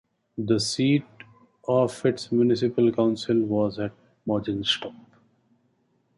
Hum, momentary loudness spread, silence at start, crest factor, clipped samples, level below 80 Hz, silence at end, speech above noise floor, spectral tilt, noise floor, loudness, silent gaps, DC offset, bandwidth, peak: none; 12 LU; 0.35 s; 18 dB; under 0.1%; -60 dBFS; 1.25 s; 45 dB; -5.5 dB/octave; -68 dBFS; -24 LUFS; none; under 0.1%; 11.5 kHz; -8 dBFS